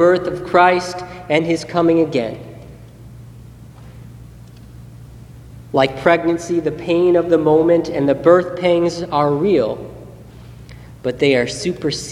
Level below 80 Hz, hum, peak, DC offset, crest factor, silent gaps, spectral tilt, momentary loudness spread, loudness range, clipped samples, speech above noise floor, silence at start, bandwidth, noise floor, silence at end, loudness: -46 dBFS; none; 0 dBFS; under 0.1%; 18 dB; none; -6 dB/octave; 14 LU; 8 LU; under 0.1%; 23 dB; 0 s; 12 kHz; -38 dBFS; 0 s; -16 LUFS